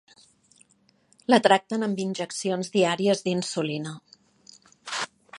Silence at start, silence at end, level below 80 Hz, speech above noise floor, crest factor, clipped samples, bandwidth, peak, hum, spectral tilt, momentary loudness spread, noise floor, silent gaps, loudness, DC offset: 1.3 s; 0 s; -76 dBFS; 40 dB; 24 dB; under 0.1%; 11.5 kHz; -2 dBFS; none; -4.5 dB/octave; 15 LU; -64 dBFS; none; -25 LUFS; under 0.1%